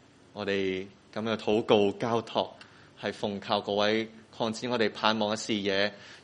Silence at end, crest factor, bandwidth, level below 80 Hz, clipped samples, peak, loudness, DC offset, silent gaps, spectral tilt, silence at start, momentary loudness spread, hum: 0.05 s; 24 dB; 10.5 kHz; -68 dBFS; under 0.1%; -6 dBFS; -29 LUFS; under 0.1%; none; -4.5 dB/octave; 0.35 s; 12 LU; none